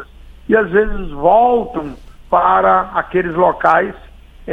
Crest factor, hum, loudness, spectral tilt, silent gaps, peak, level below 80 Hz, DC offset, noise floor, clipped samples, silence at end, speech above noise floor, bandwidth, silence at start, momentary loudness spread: 14 dB; none; -14 LUFS; -8 dB/octave; none; 0 dBFS; -32 dBFS; under 0.1%; -33 dBFS; under 0.1%; 0 s; 19 dB; 6.6 kHz; 0 s; 13 LU